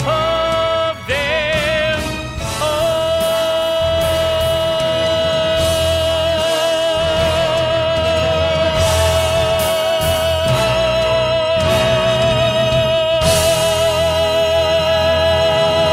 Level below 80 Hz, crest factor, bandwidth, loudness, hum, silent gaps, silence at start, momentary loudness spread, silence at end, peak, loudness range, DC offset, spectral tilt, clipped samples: -34 dBFS; 12 dB; 16 kHz; -15 LUFS; none; none; 0 s; 3 LU; 0 s; -2 dBFS; 3 LU; under 0.1%; -4 dB/octave; under 0.1%